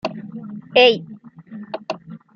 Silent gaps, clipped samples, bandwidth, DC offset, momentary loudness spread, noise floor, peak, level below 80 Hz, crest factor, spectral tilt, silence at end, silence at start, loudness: none; under 0.1%; 6.8 kHz; under 0.1%; 24 LU; -38 dBFS; -2 dBFS; -66 dBFS; 20 dB; -5 dB/octave; 0.2 s; 0.05 s; -17 LUFS